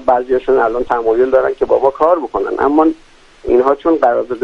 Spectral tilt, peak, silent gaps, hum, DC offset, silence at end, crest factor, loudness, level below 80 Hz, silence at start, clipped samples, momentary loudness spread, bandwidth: -7 dB/octave; 0 dBFS; none; none; under 0.1%; 0 s; 14 dB; -14 LUFS; -40 dBFS; 0 s; under 0.1%; 4 LU; 7 kHz